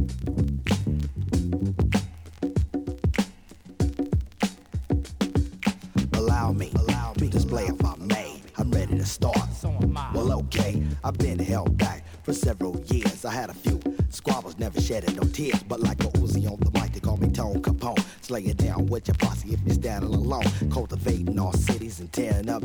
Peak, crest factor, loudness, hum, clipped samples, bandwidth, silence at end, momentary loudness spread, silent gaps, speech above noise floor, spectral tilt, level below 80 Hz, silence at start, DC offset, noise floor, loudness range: -10 dBFS; 16 dB; -26 LUFS; none; under 0.1%; 20 kHz; 0 s; 5 LU; none; 22 dB; -6.5 dB/octave; -32 dBFS; 0 s; under 0.1%; -47 dBFS; 2 LU